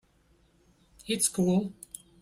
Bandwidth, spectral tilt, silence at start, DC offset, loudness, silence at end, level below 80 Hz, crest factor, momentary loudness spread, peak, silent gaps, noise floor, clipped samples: 15.5 kHz; -4.5 dB/octave; 1.05 s; under 0.1%; -28 LUFS; 0.5 s; -64 dBFS; 20 dB; 20 LU; -12 dBFS; none; -65 dBFS; under 0.1%